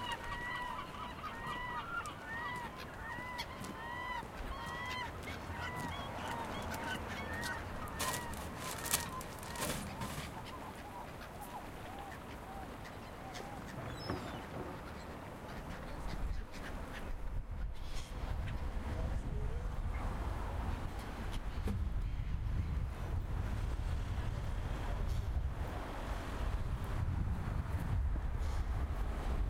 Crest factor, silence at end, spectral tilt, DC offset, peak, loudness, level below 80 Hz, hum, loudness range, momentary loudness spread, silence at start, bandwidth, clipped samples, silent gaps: 24 dB; 0 s; -4.5 dB/octave; under 0.1%; -14 dBFS; -42 LUFS; -42 dBFS; none; 6 LU; 8 LU; 0 s; 16.5 kHz; under 0.1%; none